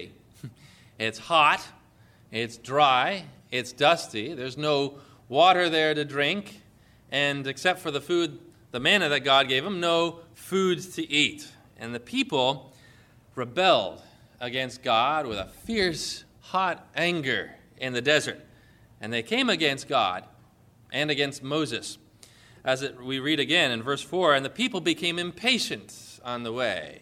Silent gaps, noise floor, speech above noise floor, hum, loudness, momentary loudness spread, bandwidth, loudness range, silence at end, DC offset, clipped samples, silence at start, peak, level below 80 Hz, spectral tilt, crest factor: none; -57 dBFS; 31 dB; none; -25 LUFS; 16 LU; 16.5 kHz; 4 LU; 0.05 s; under 0.1%; under 0.1%; 0 s; -8 dBFS; -62 dBFS; -3.5 dB/octave; 20 dB